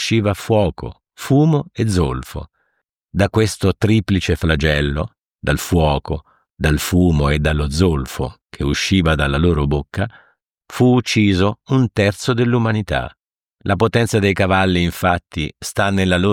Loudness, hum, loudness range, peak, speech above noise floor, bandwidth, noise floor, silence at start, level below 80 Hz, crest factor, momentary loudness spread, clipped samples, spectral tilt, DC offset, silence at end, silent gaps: -17 LUFS; none; 2 LU; -2 dBFS; 54 dB; 17.5 kHz; -70 dBFS; 0 s; -30 dBFS; 16 dB; 11 LU; under 0.1%; -6 dB/octave; under 0.1%; 0 s; none